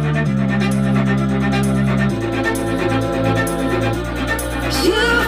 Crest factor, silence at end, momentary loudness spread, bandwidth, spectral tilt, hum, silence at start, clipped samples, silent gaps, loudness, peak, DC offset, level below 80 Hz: 14 dB; 0 s; 4 LU; 16 kHz; -6 dB/octave; none; 0 s; under 0.1%; none; -18 LUFS; -4 dBFS; 0.2%; -30 dBFS